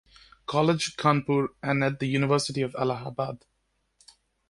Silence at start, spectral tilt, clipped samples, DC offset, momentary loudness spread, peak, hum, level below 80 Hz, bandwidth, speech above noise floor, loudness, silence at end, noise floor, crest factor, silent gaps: 0.5 s; -5.5 dB/octave; under 0.1%; under 0.1%; 9 LU; -6 dBFS; none; -62 dBFS; 11.5 kHz; 48 dB; -26 LUFS; 1.15 s; -74 dBFS; 20 dB; none